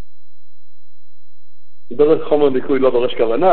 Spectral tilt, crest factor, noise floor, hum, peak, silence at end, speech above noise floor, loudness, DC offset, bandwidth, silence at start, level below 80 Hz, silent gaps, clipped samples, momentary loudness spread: -11 dB/octave; 16 dB; -70 dBFS; none; 0 dBFS; 0 s; 55 dB; -16 LUFS; 10%; 4.4 kHz; 1.9 s; -58 dBFS; none; under 0.1%; 3 LU